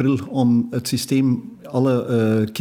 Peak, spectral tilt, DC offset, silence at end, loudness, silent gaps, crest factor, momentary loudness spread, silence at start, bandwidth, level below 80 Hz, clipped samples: -6 dBFS; -6.5 dB/octave; under 0.1%; 0 s; -20 LUFS; none; 12 dB; 5 LU; 0 s; over 20 kHz; -62 dBFS; under 0.1%